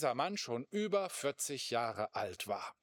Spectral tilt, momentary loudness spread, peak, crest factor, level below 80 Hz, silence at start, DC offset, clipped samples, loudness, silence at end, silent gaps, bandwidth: -3 dB/octave; 5 LU; -20 dBFS; 18 dB; -86 dBFS; 0 s; under 0.1%; under 0.1%; -38 LUFS; 0.1 s; none; over 20 kHz